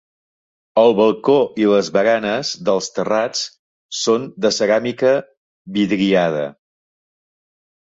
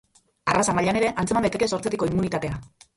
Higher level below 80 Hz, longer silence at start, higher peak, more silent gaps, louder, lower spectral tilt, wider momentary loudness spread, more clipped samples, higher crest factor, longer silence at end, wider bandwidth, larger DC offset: second, -60 dBFS vs -48 dBFS; first, 0.75 s vs 0.45 s; first, -2 dBFS vs -6 dBFS; first, 3.59-3.89 s, 5.37-5.65 s vs none; first, -17 LUFS vs -24 LUFS; about the same, -4.5 dB/octave vs -5 dB/octave; about the same, 8 LU vs 8 LU; neither; about the same, 16 dB vs 18 dB; first, 1.4 s vs 0.3 s; second, 8 kHz vs 11.5 kHz; neither